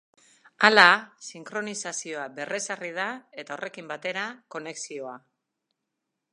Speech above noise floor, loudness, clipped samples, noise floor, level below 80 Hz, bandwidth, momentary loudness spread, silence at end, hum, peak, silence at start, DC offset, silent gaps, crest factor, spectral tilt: 57 dB; -24 LUFS; under 0.1%; -83 dBFS; -82 dBFS; 11.5 kHz; 21 LU; 1.15 s; none; 0 dBFS; 0.6 s; under 0.1%; none; 28 dB; -2 dB/octave